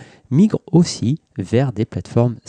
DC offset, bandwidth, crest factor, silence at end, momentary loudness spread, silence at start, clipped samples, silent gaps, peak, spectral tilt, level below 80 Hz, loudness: under 0.1%; 9.8 kHz; 14 dB; 0.1 s; 6 LU; 0 s; under 0.1%; none; -4 dBFS; -7 dB/octave; -50 dBFS; -18 LUFS